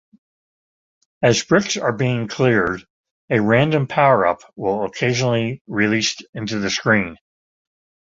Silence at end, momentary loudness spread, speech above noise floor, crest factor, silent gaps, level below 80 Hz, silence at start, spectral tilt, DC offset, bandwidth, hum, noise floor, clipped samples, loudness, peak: 0.95 s; 8 LU; over 72 dB; 18 dB; 2.90-3.04 s, 3.11-3.28 s, 5.61-5.65 s, 6.29-6.33 s; -52 dBFS; 1.2 s; -5 dB/octave; under 0.1%; 7.8 kHz; none; under -90 dBFS; under 0.1%; -19 LUFS; -2 dBFS